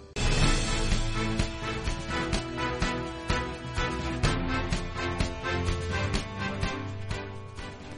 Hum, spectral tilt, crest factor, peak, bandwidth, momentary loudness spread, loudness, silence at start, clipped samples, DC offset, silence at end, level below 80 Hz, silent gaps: none; -4.5 dB/octave; 20 dB; -10 dBFS; 11.5 kHz; 8 LU; -30 LUFS; 0 s; under 0.1%; under 0.1%; 0 s; -34 dBFS; none